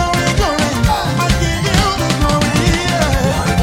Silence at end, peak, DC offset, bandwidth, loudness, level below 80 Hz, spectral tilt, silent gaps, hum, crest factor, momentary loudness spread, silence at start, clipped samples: 0 s; -2 dBFS; under 0.1%; 17 kHz; -14 LUFS; -22 dBFS; -4.5 dB/octave; none; none; 12 dB; 2 LU; 0 s; under 0.1%